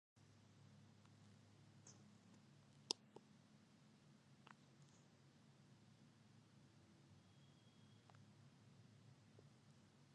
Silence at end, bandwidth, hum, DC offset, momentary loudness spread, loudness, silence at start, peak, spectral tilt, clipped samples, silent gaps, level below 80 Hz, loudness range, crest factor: 0 s; 10 kHz; none; under 0.1%; 20 LU; -60 LUFS; 0.15 s; -20 dBFS; -3 dB/octave; under 0.1%; none; under -90 dBFS; 12 LU; 44 dB